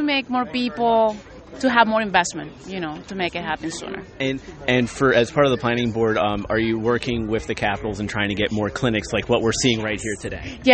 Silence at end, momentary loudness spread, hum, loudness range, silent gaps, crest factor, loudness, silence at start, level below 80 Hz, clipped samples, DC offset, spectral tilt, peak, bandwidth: 0 s; 12 LU; none; 3 LU; none; 20 dB; -21 LUFS; 0 s; -44 dBFS; under 0.1%; under 0.1%; -4.5 dB/octave; 0 dBFS; 8.8 kHz